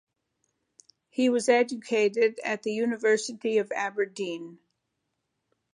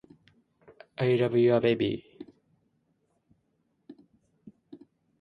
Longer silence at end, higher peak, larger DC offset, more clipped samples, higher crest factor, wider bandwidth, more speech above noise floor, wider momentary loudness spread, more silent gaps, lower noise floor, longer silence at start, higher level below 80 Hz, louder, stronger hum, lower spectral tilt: first, 1.2 s vs 0.45 s; about the same, -8 dBFS vs -10 dBFS; neither; neither; about the same, 20 dB vs 20 dB; first, 11 kHz vs 5.6 kHz; first, 54 dB vs 50 dB; second, 11 LU vs 27 LU; neither; first, -80 dBFS vs -74 dBFS; first, 1.2 s vs 1 s; second, -84 dBFS vs -68 dBFS; about the same, -27 LUFS vs -26 LUFS; neither; second, -3.5 dB/octave vs -9 dB/octave